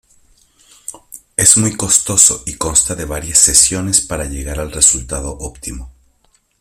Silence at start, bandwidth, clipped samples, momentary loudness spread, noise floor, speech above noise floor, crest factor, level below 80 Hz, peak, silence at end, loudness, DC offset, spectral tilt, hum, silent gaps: 0.9 s; over 20 kHz; 0.2%; 20 LU; -58 dBFS; 43 dB; 16 dB; -32 dBFS; 0 dBFS; 0.7 s; -11 LUFS; under 0.1%; -2 dB/octave; none; none